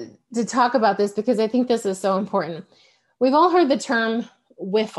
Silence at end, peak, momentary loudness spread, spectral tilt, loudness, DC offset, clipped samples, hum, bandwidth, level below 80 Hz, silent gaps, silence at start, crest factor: 0 s; -4 dBFS; 13 LU; -5 dB/octave; -21 LUFS; under 0.1%; under 0.1%; none; 12 kHz; -70 dBFS; none; 0 s; 16 dB